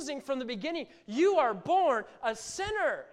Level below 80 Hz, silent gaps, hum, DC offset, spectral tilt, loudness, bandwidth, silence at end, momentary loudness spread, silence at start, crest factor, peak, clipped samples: -62 dBFS; none; none; under 0.1%; -3.5 dB/octave; -30 LUFS; 13 kHz; 0.05 s; 10 LU; 0 s; 16 dB; -14 dBFS; under 0.1%